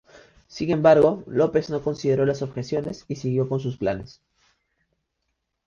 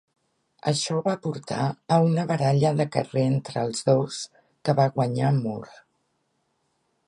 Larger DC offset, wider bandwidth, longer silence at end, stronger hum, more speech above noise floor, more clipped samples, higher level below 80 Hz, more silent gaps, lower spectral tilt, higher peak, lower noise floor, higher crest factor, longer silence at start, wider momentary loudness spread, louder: neither; second, 7.2 kHz vs 11.5 kHz; first, 1.6 s vs 1.45 s; neither; first, 55 dB vs 49 dB; neither; first, -54 dBFS vs -66 dBFS; neither; first, -7.5 dB/octave vs -6 dB/octave; about the same, -4 dBFS vs -6 dBFS; first, -77 dBFS vs -73 dBFS; about the same, 20 dB vs 18 dB; second, 0.5 s vs 0.65 s; first, 13 LU vs 10 LU; about the same, -23 LUFS vs -24 LUFS